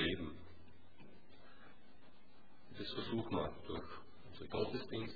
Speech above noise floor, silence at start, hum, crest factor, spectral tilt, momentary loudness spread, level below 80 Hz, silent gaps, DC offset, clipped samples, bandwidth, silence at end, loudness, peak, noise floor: 24 dB; 0 s; none; 22 dB; -4 dB/octave; 24 LU; -64 dBFS; none; 0.4%; under 0.1%; 4.9 kHz; 0 s; -44 LUFS; -24 dBFS; -67 dBFS